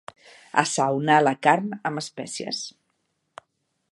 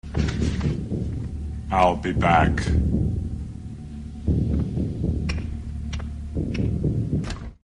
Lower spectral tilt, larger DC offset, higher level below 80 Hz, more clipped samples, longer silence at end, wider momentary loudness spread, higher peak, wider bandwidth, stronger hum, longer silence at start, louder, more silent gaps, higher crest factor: second, -4 dB/octave vs -7.5 dB/octave; neither; second, -76 dBFS vs -30 dBFS; neither; first, 1.2 s vs 0.15 s; about the same, 13 LU vs 13 LU; first, 0 dBFS vs -4 dBFS; about the same, 11.5 kHz vs 10.5 kHz; neither; first, 0.55 s vs 0.05 s; about the same, -23 LUFS vs -25 LUFS; neither; about the same, 24 dB vs 20 dB